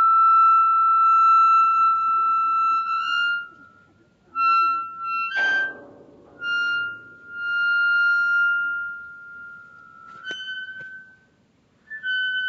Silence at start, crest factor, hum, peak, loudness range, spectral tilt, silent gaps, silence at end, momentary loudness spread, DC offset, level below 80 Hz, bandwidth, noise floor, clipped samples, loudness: 0 s; 12 dB; none; -10 dBFS; 13 LU; 3.5 dB/octave; none; 0 s; 23 LU; under 0.1%; -74 dBFS; 7 kHz; -61 dBFS; under 0.1%; -19 LUFS